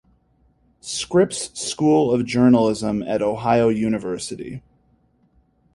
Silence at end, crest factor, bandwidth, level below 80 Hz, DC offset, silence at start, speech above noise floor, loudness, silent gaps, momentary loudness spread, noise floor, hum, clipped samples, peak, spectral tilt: 1.15 s; 18 dB; 11.5 kHz; -52 dBFS; under 0.1%; 0.85 s; 41 dB; -20 LUFS; none; 14 LU; -61 dBFS; none; under 0.1%; -2 dBFS; -5.5 dB/octave